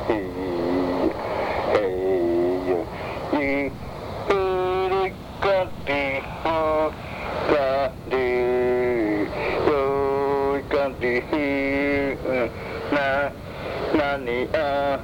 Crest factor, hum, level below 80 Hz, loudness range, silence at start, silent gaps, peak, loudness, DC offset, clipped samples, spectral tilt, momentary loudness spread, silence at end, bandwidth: 16 dB; none; -44 dBFS; 2 LU; 0 s; none; -6 dBFS; -24 LUFS; under 0.1%; under 0.1%; -6.5 dB/octave; 6 LU; 0 s; 18.5 kHz